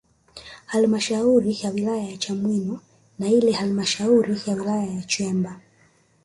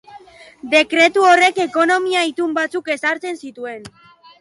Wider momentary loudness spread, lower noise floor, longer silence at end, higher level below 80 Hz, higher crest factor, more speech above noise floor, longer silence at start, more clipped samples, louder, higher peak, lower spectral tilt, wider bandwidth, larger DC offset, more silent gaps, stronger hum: second, 12 LU vs 19 LU; first, -59 dBFS vs -42 dBFS; first, 0.65 s vs 0.5 s; about the same, -60 dBFS vs -64 dBFS; about the same, 16 dB vs 16 dB; first, 38 dB vs 25 dB; first, 0.35 s vs 0.1 s; neither; second, -22 LUFS vs -15 LUFS; second, -6 dBFS vs -2 dBFS; first, -5 dB/octave vs -2 dB/octave; about the same, 11.5 kHz vs 11.5 kHz; neither; neither; neither